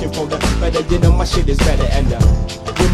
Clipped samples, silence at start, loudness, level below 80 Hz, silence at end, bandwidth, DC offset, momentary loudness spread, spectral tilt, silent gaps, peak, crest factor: under 0.1%; 0 s; -16 LUFS; -16 dBFS; 0 s; 14.5 kHz; under 0.1%; 6 LU; -5.5 dB/octave; none; 0 dBFS; 14 dB